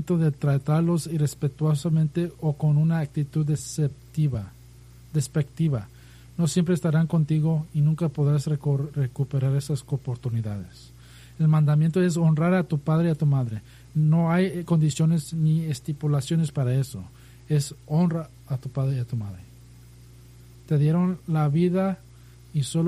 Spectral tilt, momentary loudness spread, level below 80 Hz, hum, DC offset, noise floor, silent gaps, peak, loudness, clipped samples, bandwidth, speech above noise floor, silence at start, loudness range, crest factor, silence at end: -7.5 dB/octave; 10 LU; -54 dBFS; 60 Hz at -45 dBFS; under 0.1%; -48 dBFS; none; -12 dBFS; -24 LUFS; under 0.1%; 13 kHz; 25 dB; 0 s; 5 LU; 12 dB; 0 s